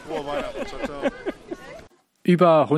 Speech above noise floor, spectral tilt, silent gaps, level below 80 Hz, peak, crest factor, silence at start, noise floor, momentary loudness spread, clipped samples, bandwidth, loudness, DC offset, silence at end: 27 dB; -7.5 dB/octave; none; -48 dBFS; -4 dBFS; 20 dB; 0 s; -48 dBFS; 21 LU; under 0.1%; 12.5 kHz; -23 LUFS; under 0.1%; 0 s